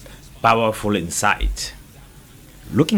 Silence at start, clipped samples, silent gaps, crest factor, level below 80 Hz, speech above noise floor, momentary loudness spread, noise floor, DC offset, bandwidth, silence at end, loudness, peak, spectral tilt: 0 s; under 0.1%; none; 18 dB; -32 dBFS; 26 dB; 12 LU; -44 dBFS; under 0.1%; over 20 kHz; 0 s; -20 LUFS; -2 dBFS; -4.5 dB/octave